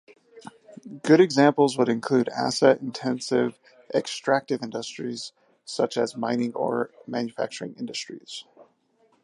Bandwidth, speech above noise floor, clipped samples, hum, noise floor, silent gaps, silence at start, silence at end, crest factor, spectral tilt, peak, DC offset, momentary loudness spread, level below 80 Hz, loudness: 11.5 kHz; 41 dB; under 0.1%; none; -65 dBFS; none; 0.35 s; 0.6 s; 22 dB; -5 dB/octave; -4 dBFS; under 0.1%; 17 LU; -76 dBFS; -24 LUFS